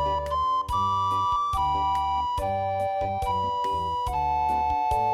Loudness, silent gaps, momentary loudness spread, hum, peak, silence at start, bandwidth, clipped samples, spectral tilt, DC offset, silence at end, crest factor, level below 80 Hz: -26 LUFS; none; 3 LU; none; -14 dBFS; 0 s; 16 kHz; under 0.1%; -5.5 dB/octave; under 0.1%; 0 s; 10 dB; -40 dBFS